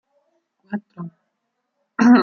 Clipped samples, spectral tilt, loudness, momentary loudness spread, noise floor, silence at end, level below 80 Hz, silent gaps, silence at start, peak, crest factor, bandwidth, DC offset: under 0.1%; -6.5 dB/octave; -21 LUFS; 21 LU; -75 dBFS; 0 s; -70 dBFS; none; 0.7 s; -4 dBFS; 18 dB; 6.8 kHz; under 0.1%